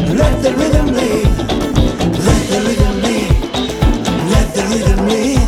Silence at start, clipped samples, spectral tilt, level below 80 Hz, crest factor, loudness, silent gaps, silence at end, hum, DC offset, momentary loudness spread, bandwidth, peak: 0 s; under 0.1%; -5.5 dB/octave; -18 dBFS; 12 dB; -14 LUFS; none; 0 s; none; under 0.1%; 2 LU; 16 kHz; 0 dBFS